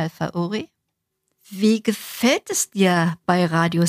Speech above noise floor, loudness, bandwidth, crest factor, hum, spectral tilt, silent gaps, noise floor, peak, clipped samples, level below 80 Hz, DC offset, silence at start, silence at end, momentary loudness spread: 57 dB; -21 LUFS; 15.5 kHz; 18 dB; none; -4.5 dB/octave; none; -77 dBFS; -2 dBFS; under 0.1%; -64 dBFS; under 0.1%; 0 s; 0 s; 9 LU